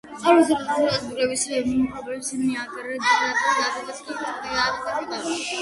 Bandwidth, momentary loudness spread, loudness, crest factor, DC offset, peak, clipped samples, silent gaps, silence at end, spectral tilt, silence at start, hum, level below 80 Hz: 11.5 kHz; 12 LU; -23 LUFS; 20 dB; under 0.1%; -4 dBFS; under 0.1%; none; 0 s; -2.5 dB/octave; 0.05 s; none; -56 dBFS